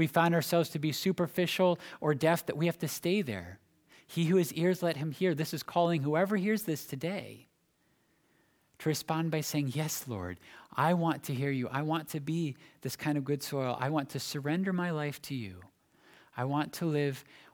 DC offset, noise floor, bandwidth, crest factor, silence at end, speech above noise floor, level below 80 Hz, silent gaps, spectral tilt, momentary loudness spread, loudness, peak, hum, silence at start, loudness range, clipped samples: under 0.1%; -73 dBFS; over 20 kHz; 20 dB; 0.3 s; 41 dB; -72 dBFS; none; -5.5 dB/octave; 11 LU; -32 LUFS; -12 dBFS; none; 0 s; 5 LU; under 0.1%